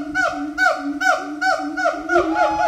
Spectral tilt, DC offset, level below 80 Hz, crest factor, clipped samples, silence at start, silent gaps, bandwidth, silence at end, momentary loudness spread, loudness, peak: -3 dB/octave; under 0.1%; -50 dBFS; 16 dB; under 0.1%; 0 s; none; 16 kHz; 0 s; 3 LU; -19 LUFS; -4 dBFS